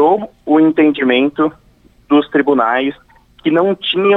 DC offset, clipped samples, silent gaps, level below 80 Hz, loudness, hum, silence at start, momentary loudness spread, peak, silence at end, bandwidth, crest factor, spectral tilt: under 0.1%; under 0.1%; none; -54 dBFS; -14 LUFS; none; 0 s; 7 LU; -2 dBFS; 0 s; 4 kHz; 12 dB; -7.5 dB/octave